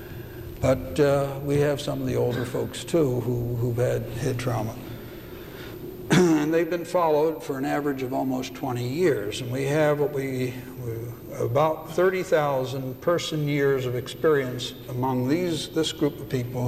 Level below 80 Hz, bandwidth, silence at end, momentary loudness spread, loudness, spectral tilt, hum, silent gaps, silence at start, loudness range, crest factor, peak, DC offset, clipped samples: -50 dBFS; 15 kHz; 0 s; 13 LU; -25 LUFS; -6 dB/octave; none; none; 0 s; 2 LU; 16 dB; -10 dBFS; under 0.1%; under 0.1%